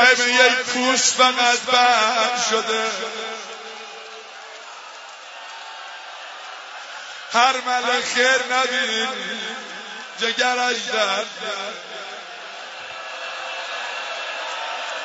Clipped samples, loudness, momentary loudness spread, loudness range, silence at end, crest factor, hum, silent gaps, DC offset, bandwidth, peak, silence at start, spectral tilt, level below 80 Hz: under 0.1%; -19 LUFS; 20 LU; 16 LU; 0 s; 22 dB; none; none; under 0.1%; 8 kHz; 0 dBFS; 0 s; 0.5 dB/octave; -76 dBFS